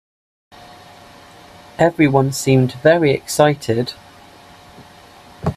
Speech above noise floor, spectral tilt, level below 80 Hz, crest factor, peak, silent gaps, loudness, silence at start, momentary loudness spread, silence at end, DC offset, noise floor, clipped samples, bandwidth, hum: 28 dB; -6 dB/octave; -50 dBFS; 18 dB; 0 dBFS; none; -16 LUFS; 1.8 s; 13 LU; 0 s; under 0.1%; -43 dBFS; under 0.1%; 15.5 kHz; none